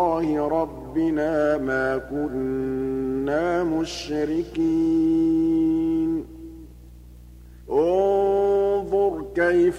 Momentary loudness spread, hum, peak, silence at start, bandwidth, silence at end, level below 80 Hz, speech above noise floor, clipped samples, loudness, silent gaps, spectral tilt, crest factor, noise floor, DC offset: 7 LU; 60 Hz at -45 dBFS; -10 dBFS; 0 s; 10 kHz; 0 s; -46 dBFS; 22 dB; under 0.1%; -23 LUFS; none; -6.5 dB/octave; 12 dB; -44 dBFS; under 0.1%